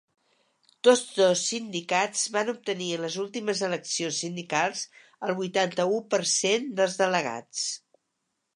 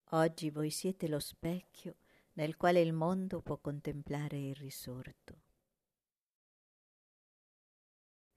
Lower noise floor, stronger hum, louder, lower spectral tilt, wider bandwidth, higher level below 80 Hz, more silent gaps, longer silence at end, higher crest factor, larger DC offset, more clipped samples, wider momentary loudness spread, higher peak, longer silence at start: second, -79 dBFS vs under -90 dBFS; neither; first, -26 LUFS vs -37 LUFS; second, -2.5 dB/octave vs -6 dB/octave; second, 11.5 kHz vs 14 kHz; second, -82 dBFS vs -66 dBFS; neither; second, 0.8 s vs 3 s; about the same, 22 dB vs 20 dB; neither; neither; second, 9 LU vs 19 LU; first, -6 dBFS vs -18 dBFS; first, 0.85 s vs 0.1 s